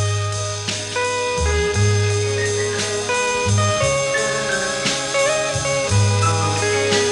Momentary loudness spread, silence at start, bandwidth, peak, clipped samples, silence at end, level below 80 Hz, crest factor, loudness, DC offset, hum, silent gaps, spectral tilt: 4 LU; 0 s; 12 kHz; -6 dBFS; under 0.1%; 0 s; -38 dBFS; 14 dB; -19 LUFS; under 0.1%; none; none; -3.5 dB/octave